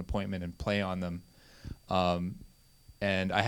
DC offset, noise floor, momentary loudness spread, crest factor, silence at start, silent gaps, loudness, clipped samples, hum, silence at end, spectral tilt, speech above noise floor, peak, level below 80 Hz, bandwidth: under 0.1%; -59 dBFS; 19 LU; 26 dB; 0 s; none; -33 LUFS; under 0.1%; none; 0 s; -6.5 dB/octave; 27 dB; -8 dBFS; -50 dBFS; 18.5 kHz